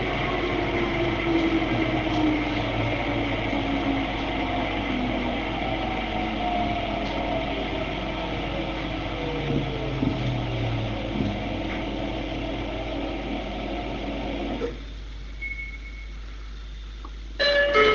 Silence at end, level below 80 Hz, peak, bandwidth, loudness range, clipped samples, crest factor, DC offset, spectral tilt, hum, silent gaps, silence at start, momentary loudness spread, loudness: 0 s; -36 dBFS; -6 dBFS; 7.2 kHz; 7 LU; under 0.1%; 20 dB; under 0.1%; -6.5 dB/octave; none; none; 0 s; 14 LU; -27 LUFS